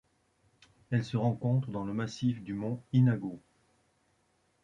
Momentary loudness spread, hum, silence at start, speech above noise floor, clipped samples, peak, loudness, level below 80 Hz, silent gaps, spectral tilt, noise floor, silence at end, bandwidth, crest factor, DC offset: 9 LU; none; 0.9 s; 42 dB; under 0.1%; -16 dBFS; -32 LUFS; -66 dBFS; none; -8 dB/octave; -73 dBFS; 1.25 s; 7.6 kHz; 18 dB; under 0.1%